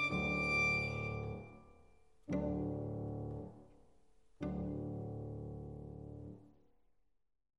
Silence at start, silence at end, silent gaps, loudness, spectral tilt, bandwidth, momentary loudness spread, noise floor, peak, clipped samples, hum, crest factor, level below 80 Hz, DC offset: 0 s; 1.1 s; none; -39 LUFS; -6.5 dB/octave; 11 kHz; 19 LU; -79 dBFS; -24 dBFS; under 0.1%; none; 18 dB; -56 dBFS; under 0.1%